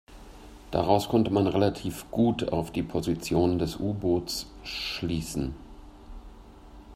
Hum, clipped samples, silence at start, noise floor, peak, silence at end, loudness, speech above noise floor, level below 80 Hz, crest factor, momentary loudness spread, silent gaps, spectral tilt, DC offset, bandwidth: none; under 0.1%; 0.1 s; -48 dBFS; -6 dBFS; 0 s; -28 LUFS; 21 dB; -46 dBFS; 22 dB; 16 LU; none; -6 dB/octave; under 0.1%; 16 kHz